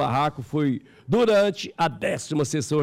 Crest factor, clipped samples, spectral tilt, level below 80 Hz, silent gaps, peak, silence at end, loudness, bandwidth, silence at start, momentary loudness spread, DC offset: 10 dB; under 0.1%; -5.5 dB/octave; -56 dBFS; none; -14 dBFS; 0 s; -24 LUFS; 16 kHz; 0 s; 7 LU; under 0.1%